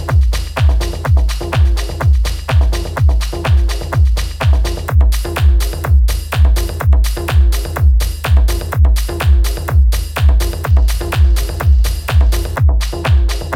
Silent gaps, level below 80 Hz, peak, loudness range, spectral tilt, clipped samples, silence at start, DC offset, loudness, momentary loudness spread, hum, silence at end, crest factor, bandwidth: none; -12 dBFS; -2 dBFS; 1 LU; -5.5 dB/octave; under 0.1%; 0 s; under 0.1%; -14 LUFS; 3 LU; none; 0 s; 10 dB; 16.5 kHz